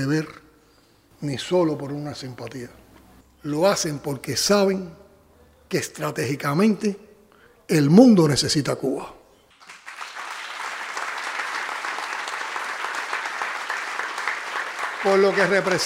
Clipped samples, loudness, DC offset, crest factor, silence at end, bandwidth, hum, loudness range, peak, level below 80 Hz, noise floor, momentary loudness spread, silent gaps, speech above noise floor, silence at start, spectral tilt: under 0.1%; -23 LUFS; under 0.1%; 22 dB; 0 s; 16 kHz; none; 10 LU; -2 dBFS; -60 dBFS; -57 dBFS; 17 LU; none; 36 dB; 0 s; -5 dB/octave